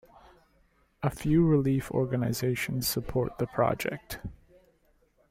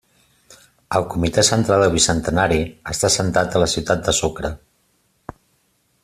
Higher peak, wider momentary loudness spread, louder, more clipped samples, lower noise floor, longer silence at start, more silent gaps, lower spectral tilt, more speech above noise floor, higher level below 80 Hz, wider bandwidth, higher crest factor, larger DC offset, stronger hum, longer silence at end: second, -12 dBFS vs 0 dBFS; first, 13 LU vs 9 LU; second, -28 LUFS vs -18 LUFS; neither; about the same, -67 dBFS vs -64 dBFS; about the same, 1 s vs 0.9 s; neither; first, -6 dB/octave vs -3.5 dB/octave; second, 39 dB vs 46 dB; second, -50 dBFS vs -40 dBFS; about the same, 16.5 kHz vs 15 kHz; about the same, 18 dB vs 20 dB; neither; neither; second, 0.95 s vs 1.45 s